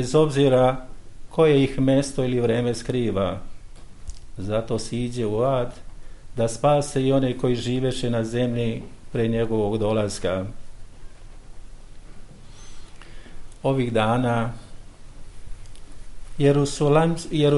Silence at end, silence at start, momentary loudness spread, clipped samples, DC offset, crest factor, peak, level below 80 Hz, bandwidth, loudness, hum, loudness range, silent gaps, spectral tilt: 0 s; 0 s; 14 LU; under 0.1%; under 0.1%; 18 dB; -6 dBFS; -40 dBFS; 11.5 kHz; -23 LUFS; none; 6 LU; none; -6.5 dB/octave